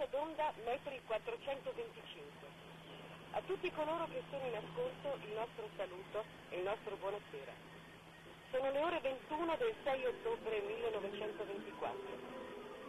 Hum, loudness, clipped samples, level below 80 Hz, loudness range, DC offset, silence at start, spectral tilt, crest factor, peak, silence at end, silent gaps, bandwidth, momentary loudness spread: none; -43 LUFS; under 0.1%; -70 dBFS; 5 LU; under 0.1%; 0 s; -5.5 dB/octave; 14 dB; -28 dBFS; 0 s; none; 13 kHz; 15 LU